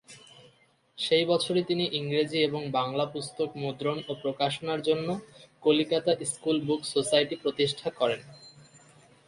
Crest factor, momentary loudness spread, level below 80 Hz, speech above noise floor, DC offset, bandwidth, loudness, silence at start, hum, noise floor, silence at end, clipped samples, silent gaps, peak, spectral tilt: 20 dB; 8 LU; -70 dBFS; 36 dB; under 0.1%; 11.5 kHz; -28 LUFS; 0.1 s; none; -63 dBFS; 0.75 s; under 0.1%; none; -10 dBFS; -4.5 dB/octave